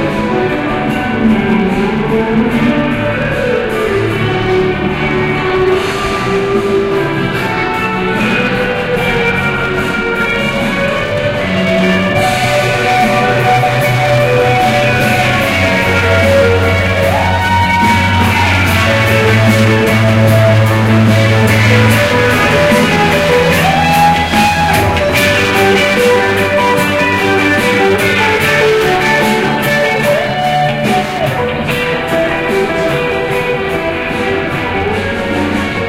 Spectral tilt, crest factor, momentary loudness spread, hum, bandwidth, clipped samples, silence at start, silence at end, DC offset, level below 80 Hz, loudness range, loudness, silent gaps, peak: -5.5 dB/octave; 10 dB; 5 LU; none; 16.5 kHz; under 0.1%; 0 s; 0 s; under 0.1%; -32 dBFS; 4 LU; -11 LUFS; none; 0 dBFS